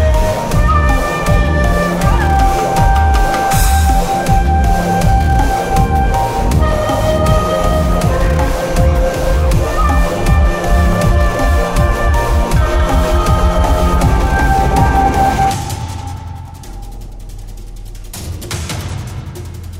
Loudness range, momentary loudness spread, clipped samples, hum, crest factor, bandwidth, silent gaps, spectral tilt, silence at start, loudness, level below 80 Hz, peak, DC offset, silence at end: 7 LU; 15 LU; under 0.1%; none; 12 dB; 16.5 kHz; none; -6 dB/octave; 0 s; -13 LUFS; -16 dBFS; 0 dBFS; under 0.1%; 0 s